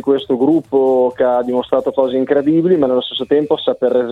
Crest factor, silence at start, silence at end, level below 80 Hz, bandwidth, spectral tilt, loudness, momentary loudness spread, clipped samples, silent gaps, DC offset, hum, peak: 12 dB; 0.05 s; 0 s; -54 dBFS; 4.6 kHz; -8 dB/octave; -15 LUFS; 3 LU; under 0.1%; none; under 0.1%; none; -2 dBFS